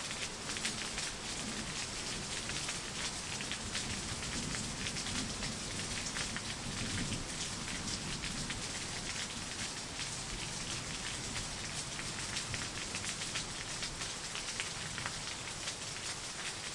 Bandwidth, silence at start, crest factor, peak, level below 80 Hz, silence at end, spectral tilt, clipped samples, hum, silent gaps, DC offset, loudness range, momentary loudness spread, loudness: 11.5 kHz; 0 s; 24 dB; -16 dBFS; -54 dBFS; 0 s; -2 dB/octave; under 0.1%; none; none; under 0.1%; 1 LU; 2 LU; -38 LUFS